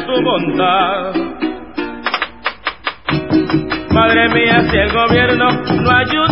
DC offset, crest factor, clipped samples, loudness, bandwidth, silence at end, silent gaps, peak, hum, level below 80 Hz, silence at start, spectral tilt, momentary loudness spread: 0.9%; 14 dB; under 0.1%; -14 LUFS; 5.8 kHz; 0 s; none; 0 dBFS; none; -34 dBFS; 0 s; -9 dB/octave; 11 LU